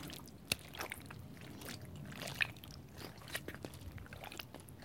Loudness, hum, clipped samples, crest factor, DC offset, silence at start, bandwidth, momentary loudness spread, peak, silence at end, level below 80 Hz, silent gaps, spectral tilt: -45 LUFS; none; under 0.1%; 34 dB; under 0.1%; 0 s; 17 kHz; 13 LU; -12 dBFS; 0 s; -62 dBFS; none; -3 dB/octave